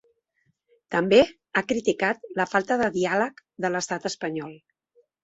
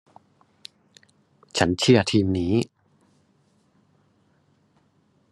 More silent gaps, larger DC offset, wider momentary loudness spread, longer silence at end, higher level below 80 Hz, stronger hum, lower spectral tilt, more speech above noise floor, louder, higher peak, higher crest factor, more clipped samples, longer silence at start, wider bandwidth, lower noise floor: neither; neither; second, 11 LU vs 28 LU; second, 0.65 s vs 2.65 s; about the same, -62 dBFS vs -60 dBFS; neither; about the same, -4.5 dB/octave vs -5.5 dB/octave; first, 48 dB vs 44 dB; second, -25 LUFS vs -22 LUFS; about the same, -4 dBFS vs -2 dBFS; about the same, 22 dB vs 24 dB; neither; second, 0.9 s vs 1.55 s; second, 8 kHz vs 12 kHz; first, -72 dBFS vs -64 dBFS